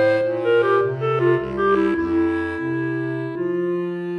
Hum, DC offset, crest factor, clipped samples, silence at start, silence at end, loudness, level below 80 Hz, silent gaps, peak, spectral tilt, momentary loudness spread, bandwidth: none; under 0.1%; 14 dB; under 0.1%; 0 s; 0 s; -21 LUFS; -50 dBFS; none; -6 dBFS; -8.5 dB/octave; 6 LU; 6 kHz